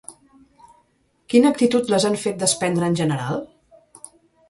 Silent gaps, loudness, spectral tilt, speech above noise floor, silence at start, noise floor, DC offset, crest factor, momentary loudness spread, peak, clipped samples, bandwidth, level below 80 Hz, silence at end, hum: none; -20 LUFS; -4.5 dB/octave; 45 dB; 0.1 s; -64 dBFS; under 0.1%; 20 dB; 10 LU; -2 dBFS; under 0.1%; 11.5 kHz; -62 dBFS; 1.05 s; none